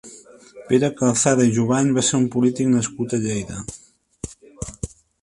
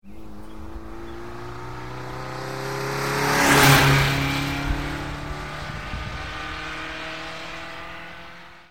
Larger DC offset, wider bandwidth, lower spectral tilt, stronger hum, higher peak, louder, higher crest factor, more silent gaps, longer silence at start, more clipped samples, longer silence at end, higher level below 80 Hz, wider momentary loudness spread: second, under 0.1% vs 0.6%; second, 11.5 kHz vs 16.5 kHz; about the same, -5 dB/octave vs -4 dB/octave; neither; about the same, -2 dBFS vs -2 dBFS; first, -19 LUFS vs -22 LUFS; second, 18 dB vs 24 dB; neither; about the same, 0.05 s vs 0 s; neither; first, 0.35 s vs 0 s; second, -48 dBFS vs -38 dBFS; second, 19 LU vs 23 LU